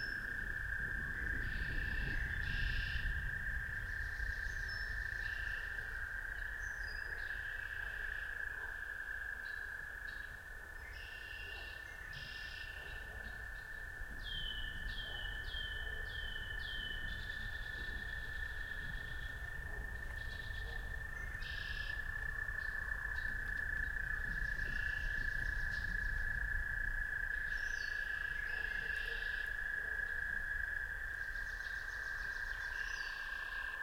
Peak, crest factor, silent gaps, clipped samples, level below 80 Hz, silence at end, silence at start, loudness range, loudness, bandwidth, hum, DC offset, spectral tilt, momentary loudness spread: -26 dBFS; 16 dB; none; under 0.1%; -46 dBFS; 0 s; 0 s; 6 LU; -41 LUFS; 16.5 kHz; none; under 0.1%; -3.5 dB/octave; 7 LU